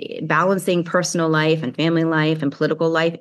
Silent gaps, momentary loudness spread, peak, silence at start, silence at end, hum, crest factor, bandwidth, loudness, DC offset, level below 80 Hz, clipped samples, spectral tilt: none; 3 LU; -4 dBFS; 0 s; 0 s; none; 16 dB; 12.5 kHz; -19 LUFS; under 0.1%; -80 dBFS; under 0.1%; -5.5 dB/octave